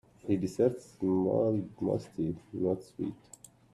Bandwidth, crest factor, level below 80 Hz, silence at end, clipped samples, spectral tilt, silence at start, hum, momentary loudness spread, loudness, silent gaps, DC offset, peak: 13 kHz; 18 dB; -64 dBFS; 0.6 s; under 0.1%; -8.5 dB/octave; 0.25 s; none; 11 LU; -32 LUFS; none; under 0.1%; -14 dBFS